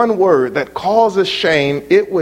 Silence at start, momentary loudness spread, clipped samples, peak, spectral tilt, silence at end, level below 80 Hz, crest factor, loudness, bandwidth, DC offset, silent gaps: 0 s; 4 LU; under 0.1%; 0 dBFS; -5.5 dB/octave; 0 s; -52 dBFS; 14 dB; -14 LUFS; 12 kHz; under 0.1%; none